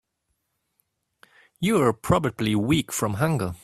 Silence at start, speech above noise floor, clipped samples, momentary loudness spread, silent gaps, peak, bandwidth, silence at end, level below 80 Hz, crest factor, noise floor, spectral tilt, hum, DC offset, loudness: 1.6 s; 54 dB; under 0.1%; 4 LU; none; -6 dBFS; 15.5 kHz; 0.05 s; -50 dBFS; 20 dB; -77 dBFS; -5.5 dB/octave; none; under 0.1%; -23 LUFS